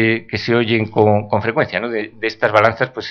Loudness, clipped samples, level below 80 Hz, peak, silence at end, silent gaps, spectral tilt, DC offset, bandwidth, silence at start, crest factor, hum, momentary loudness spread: -17 LUFS; under 0.1%; -54 dBFS; 0 dBFS; 0 s; none; -7 dB/octave; under 0.1%; 6.6 kHz; 0 s; 16 dB; none; 8 LU